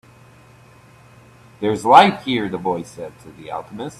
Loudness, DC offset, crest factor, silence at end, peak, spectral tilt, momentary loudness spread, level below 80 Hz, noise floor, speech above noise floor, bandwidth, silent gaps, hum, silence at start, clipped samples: -16 LUFS; under 0.1%; 20 dB; 0.1 s; 0 dBFS; -5 dB/octave; 23 LU; -58 dBFS; -47 dBFS; 29 dB; 13 kHz; none; none; 1.6 s; under 0.1%